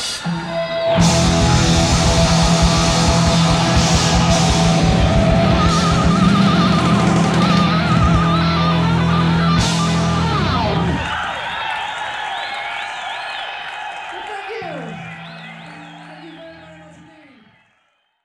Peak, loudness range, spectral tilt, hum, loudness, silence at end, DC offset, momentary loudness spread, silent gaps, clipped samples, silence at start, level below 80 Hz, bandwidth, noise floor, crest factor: -2 dBFS; 15 LU; -5 dB/octave; none; -15 LUFS; 1.4 s; under 0.1%; 15 LU; none; under 0.1%; 0 s; -28 dBFS; 12 kHz; -63 dBFS; 14 dB